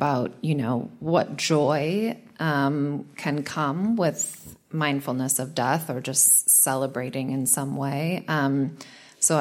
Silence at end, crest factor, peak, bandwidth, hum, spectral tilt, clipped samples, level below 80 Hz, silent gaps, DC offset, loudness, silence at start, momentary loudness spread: 0 s; 18 dB; -6 dBFS; 16.5 kHz; none; -4 dB/octave; under 0.1%; -68 dBFS; none; under 0.1%; -23 LUFS; 0 s; 12 LU